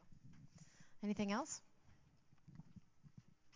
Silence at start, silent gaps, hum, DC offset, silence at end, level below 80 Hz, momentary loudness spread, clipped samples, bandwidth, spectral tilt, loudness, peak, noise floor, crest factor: 0.05 s; none; none; under 0.1%; 0.05 s; -76 dBFS; 24 LU; under 0.1%; 7.6 kHz; -4.5 dB/octave; -44 LUFS; -30 dBFS; -69 dBFS; 20 dB